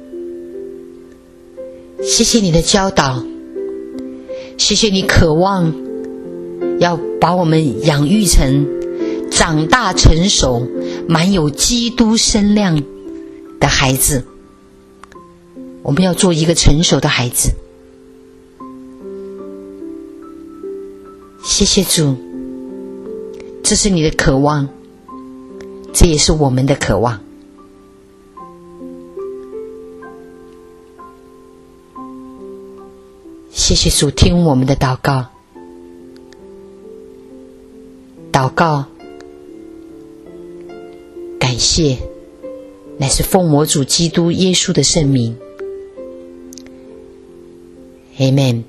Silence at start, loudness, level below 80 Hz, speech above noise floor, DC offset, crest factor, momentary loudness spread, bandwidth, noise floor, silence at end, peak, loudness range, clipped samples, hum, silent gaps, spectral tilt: 0 s; -13 LUFS; -26 dBFS; 31 dB; under 0.1%; 16 dB; 23 LU; 13.5 kHz; -43 dBFS; 0.05 s; 0 dBFS; 15 LU; under 0.1%; none; none; -4 dB/octave